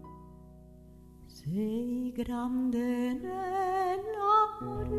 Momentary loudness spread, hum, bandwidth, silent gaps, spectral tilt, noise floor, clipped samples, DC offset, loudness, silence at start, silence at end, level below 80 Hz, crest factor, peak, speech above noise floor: 13 LU; none; 13.5 kHz; none; -7 dB/octave; -53 dBFS; under 0.1%; under 0.1%; -31 LUFS; 0 s; 0 s; -52 dBFS; 16 dB; -16 dBFS; 21 dB